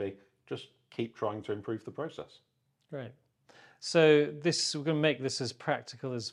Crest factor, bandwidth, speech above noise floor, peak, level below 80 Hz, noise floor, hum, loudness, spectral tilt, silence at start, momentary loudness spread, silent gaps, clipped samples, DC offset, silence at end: 22 dB; 11.5 kHz; 29 dB; -10 dBFS; -78 dBFS; -60 dBFS; none; -31 LUFS; -4.5 dB/octave; 0 s; 19 LU; none; under 0.1%; under 0.1%; 0 s